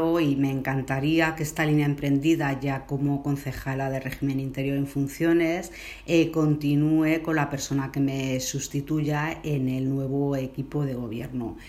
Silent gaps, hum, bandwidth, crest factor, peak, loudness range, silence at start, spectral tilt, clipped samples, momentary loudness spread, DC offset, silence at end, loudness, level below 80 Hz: none; none; 15.5 kHz; 16 dB; -8 dBFS; 3 LU; 0 s; -6 dB/octave; under 0.1%; 7 LU; under 0.1%; 0 s; -26 LUFS; -50 dBFS